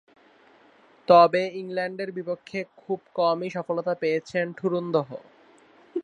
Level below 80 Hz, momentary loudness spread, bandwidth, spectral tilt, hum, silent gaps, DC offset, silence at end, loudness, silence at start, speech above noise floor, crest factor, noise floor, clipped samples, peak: -74 dBFS; 17 LU; 9.6 kHz; -6.5 dB/octave; none; none; under 0.1%; 0 s; -25 LUFS; 1.1 s; 32 dB; 22 dB; -57 dBFS; under 0.1%; -4 dBFS